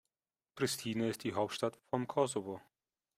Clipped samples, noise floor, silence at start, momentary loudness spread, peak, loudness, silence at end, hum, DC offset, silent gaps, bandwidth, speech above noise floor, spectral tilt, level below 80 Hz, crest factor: under 0.1%; under -90 dBFS; 0.55 s; 6 LU; -18 dBFS; -37 LUFS; 0.55 s; none; under 0.1%; none; 16 kHz; over 54 dB; -4.5 dB/octave; -76 dBFS; 20 dB